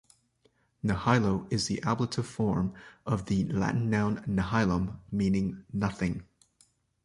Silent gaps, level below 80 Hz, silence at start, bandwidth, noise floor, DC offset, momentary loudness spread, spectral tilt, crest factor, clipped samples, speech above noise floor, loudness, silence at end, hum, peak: none; -50 dBFS; 0.85 s; 11.5 kHz; -70 dBFS; under 0.1%; 7 LU; -6.5 dB/octave; 20 dB; under 0.1%; 41 dB; -30 LUFS; 0.8 s; none; -10 dBFS